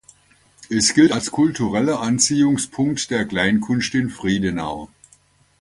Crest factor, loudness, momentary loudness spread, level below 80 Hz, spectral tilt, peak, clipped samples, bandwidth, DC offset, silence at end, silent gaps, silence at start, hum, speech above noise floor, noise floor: 18 dB; -19 LUFS; 7 LU; -50 dBFS; -4 dB/octave; -2 dBFS; under 0.1%; 11.5 kHz; under 0.1%; 0.75 s; none; 0.6 s; none; 37 dB; -56 dBFS